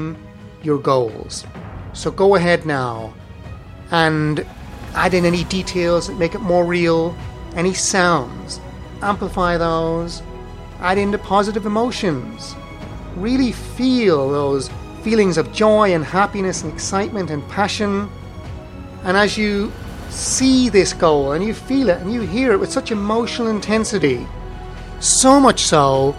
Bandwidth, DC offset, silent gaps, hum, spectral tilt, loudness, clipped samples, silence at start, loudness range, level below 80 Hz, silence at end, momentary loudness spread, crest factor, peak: 13.5 kHz; under 0.1%; none; none; -4.5 dB/octave; -17 LUFS; under 0.1%; 0 s; 4 LU; -36 dBFS; 0 s; 19 LU; 18 dB; 0 dBFS